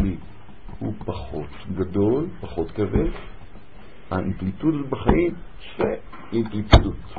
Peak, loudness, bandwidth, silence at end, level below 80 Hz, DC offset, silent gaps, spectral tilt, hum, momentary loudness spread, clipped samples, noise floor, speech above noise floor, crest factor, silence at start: 0 dBFS; -24 LUFS; 7.2 kHz; 0 s; -30 dBFS; 2%; none; -8 dB/octave; none; 16 LU; under 0.1%; -46 dBFS; 24 dB; 24 dB; 0 s